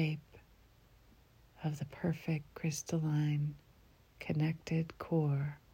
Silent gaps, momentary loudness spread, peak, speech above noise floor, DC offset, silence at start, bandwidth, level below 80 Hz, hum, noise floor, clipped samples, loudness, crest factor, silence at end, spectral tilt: none; 8 LU; -22 dBFS; 29 dB; under 0.1%; 0 s; 16 kHz; -66 dBFS; none; -64 dBFS; under 0.1%; -37 LUFS; 16 dB; 0.15 s; -6.5 dB/octave